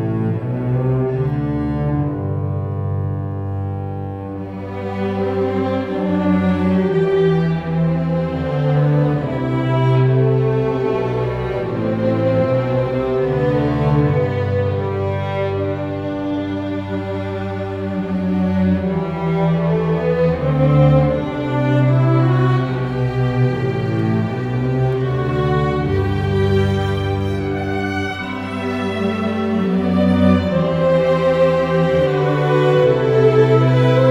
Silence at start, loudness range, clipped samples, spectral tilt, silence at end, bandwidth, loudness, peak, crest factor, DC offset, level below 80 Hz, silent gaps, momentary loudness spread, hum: 0 s; 6 LU; under 0.1%; -9 dB/octave; 0 s; 7.4 kHz; -18 LUFS; -2 dBFS; 16 dB; under 0.1%; -38 dBFS; none; 9 LU; none